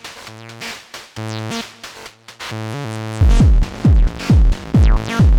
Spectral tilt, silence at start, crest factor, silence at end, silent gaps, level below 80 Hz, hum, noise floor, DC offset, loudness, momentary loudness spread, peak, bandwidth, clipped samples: -6.5 dB/octave; 0.05 s; 12 dB; 0 s; none; -18 dBFS; none; -38 dBFS; under 0.1%; -17 LUFS; 19 LU; -2 dBFS; 12 kHz; under 0.1%